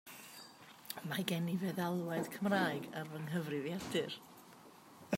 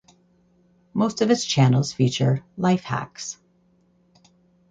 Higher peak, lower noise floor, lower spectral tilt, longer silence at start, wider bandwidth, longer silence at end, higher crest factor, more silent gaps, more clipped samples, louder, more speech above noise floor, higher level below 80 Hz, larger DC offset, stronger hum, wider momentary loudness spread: second, -18 dBFS vs -4 dBFS; about the same, -59 dBFS vs -62 dBFS; about the same, -5.5 dB/octave vs -5.5 dB/octave; second, 0.05 s vs 0.95 s; first, 16 kHz vs 9.2 kHz; second, 0 s vs 1.4 s; about the same, 22 dB vs 20 dB; neither; neither; second, -39 LUFS vs -22 LUFS; second, 21 dB vs 40 dB; second, -78 dBFS vs -60 dBFS; neither; neither; first, 22 LU vs 15 LU